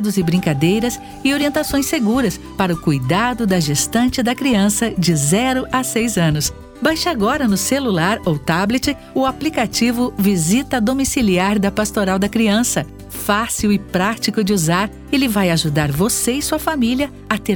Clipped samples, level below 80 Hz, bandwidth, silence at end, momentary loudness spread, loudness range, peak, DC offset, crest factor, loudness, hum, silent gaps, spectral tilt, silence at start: under 0.1%; -38 dBFS; over 20 kHz; 0 s; 4 LU; 1 LU; 0 dBFS; under 0.1%; 16 dB; -17 LUFS; none; none; -4.5 dB/octave; 0 s